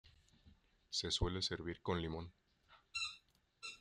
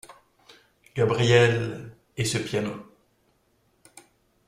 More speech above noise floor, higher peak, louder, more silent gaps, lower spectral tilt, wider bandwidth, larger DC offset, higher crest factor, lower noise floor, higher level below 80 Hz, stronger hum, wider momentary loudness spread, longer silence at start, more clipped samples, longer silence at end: second, 29 dB vs 44 dB; second, -24 dBFS vs -6 dBFS; second, -42 LUFS vs -24 LUFS; neither; about the same, -4 dB/octave vs -5 dB/octave; second, 11.5 kHz vs 15 kHz; neither; about the same, 20 dB vs 22 dB; about the same, -70 dBFS vs -67 dBFS; about the same, -56 dBFS vs -58 dBFS; neither; second, 14 LU vs 21 LU; about the same, 0.05 s vs 0.1 s; neither; second, 0.05 s vs 1.65 s